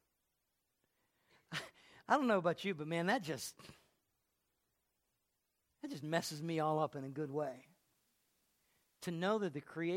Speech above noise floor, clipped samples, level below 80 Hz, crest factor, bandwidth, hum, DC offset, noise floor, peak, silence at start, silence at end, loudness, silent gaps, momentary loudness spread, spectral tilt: 47 dB; under 0.1%; -84 dBFS; 24 dB; 16.5 kHz; none; under 0.1%; -85 dBFS; -18 dBFS; 1.5 s; 0 s; -39 LUFS; none; 14 LU; -5 dB/octave